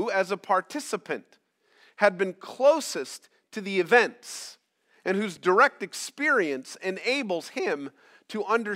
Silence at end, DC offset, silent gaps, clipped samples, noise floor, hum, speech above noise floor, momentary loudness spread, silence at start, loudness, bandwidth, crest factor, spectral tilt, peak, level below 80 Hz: 0 s; under 0.1%; none; under 0.1%; -62 dBFS; none; 36 dB; 16 LU; 0 s; -26 LUFS; 16 kHz; 24 dB; -3.5 dB/octave; -4 dBFS; -90 dBFS